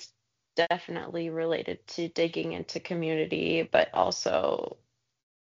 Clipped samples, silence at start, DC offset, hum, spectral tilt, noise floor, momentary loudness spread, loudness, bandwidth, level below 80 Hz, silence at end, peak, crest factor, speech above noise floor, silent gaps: under 0.1%; 0 s; under 0.1%; none; -3 dB/octave; -68 dBFS; 10 LU; -29 LUFS; 7.4 kHz; -68 dBFS; 0.8 s; -8 dBFS; 22 dB; 39 dB; none